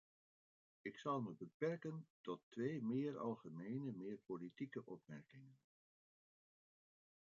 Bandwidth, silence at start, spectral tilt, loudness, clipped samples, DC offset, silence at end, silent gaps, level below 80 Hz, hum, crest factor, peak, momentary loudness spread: 7.2 kHz; 0.85 s; -7 dB/octave; -48 LUFS; under 0.1%; under 0.1%; 1.7 s; 1.54-1.60 s, 2.10-2.24 s, 2.43-2.51 s; under -90 dBFS; none; 20 dB; -30 dBFS; 12 LU